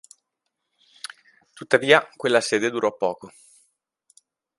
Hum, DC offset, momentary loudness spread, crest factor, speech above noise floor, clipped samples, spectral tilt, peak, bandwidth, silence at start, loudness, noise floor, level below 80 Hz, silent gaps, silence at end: none; under 0.1%; 22 LU; 24 dB; 58 dB; under 0.1%; -3.5 dB/octave; 0 dBFS; 11.5 kHz; 1.6 s; -21 LUFS; -80 dBFS; -72 dBFS; none; 1.3 s